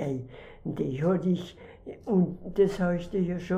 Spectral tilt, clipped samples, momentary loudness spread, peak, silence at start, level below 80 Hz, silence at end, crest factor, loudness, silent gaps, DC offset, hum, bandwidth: -8.5 dB/octave; under 0.1%; 18 LU; -12 dBFS; 0 s; -52 dBFS; 0 s; 16 dB; -28 LUFS; none; under 0.1%; none; 8.6 kHz